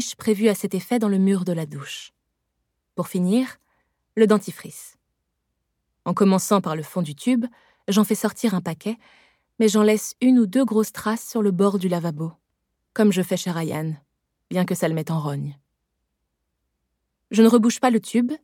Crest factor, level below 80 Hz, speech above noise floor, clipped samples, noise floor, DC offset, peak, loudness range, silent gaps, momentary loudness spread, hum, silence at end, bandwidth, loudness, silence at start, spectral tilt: 20 dB; -72 dBFS; 56 dB; under 0.1%; -77 dBFS; under 0.1%; -4 dBFS; 5 LU; none; 15 LU; none; 0.05 s; 18 kHz; -22 LUFS; 0 s; -6 dB/octave